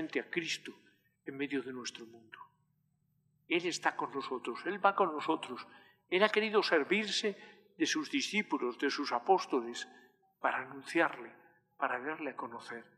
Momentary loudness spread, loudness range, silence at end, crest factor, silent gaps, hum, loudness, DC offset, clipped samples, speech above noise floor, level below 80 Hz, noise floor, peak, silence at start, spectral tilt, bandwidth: 19 LU; 7 LU; 0.15 s; 24 dB; none; none; -34 LUFS; under 0.1%; under 0.1%; 42 dB; under -90 dBFS; -77 dBFS; -12 dBFS; 0 s; -3 dB/octave; 12.5 kHz